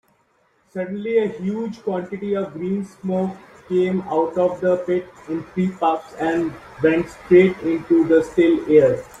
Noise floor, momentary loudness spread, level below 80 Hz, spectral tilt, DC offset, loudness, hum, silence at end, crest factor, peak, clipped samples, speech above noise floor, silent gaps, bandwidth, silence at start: -62 dBFS; 12 LU; -56 dBFS; -8 dB/octave; under 0.1%; -20 LUFS; none; 0.05 s; 18 dB; -2 dBFS; under 0.1%; 43 dB; none; 9.6 kHz; 0.75 s